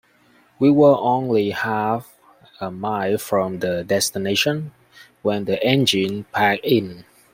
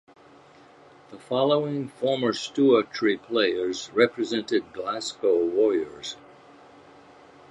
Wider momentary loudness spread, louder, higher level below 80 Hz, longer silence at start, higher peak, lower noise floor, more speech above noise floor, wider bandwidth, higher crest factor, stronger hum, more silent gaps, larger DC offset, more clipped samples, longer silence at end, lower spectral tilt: first, 13 LU vs 9 LU; first, -20 LUFS vs -25 LUFS; first, -60 dBFS vs -70 dBFS; second, 0.6 s vs 1.1 s; first, -2 dBFS vs -6 dBFS; first, -56 dBFS vs -52 dBFS; first, 37 dB vs 28 dB; first, 16.5 kHz vs 11 kHz; about the same, 18 dB vs 20 dB; neither; neither; neither; neither; second, 0.35 s vs 1.35 s; about the same, -4.5 dB/octave vs -4.5 dB/octave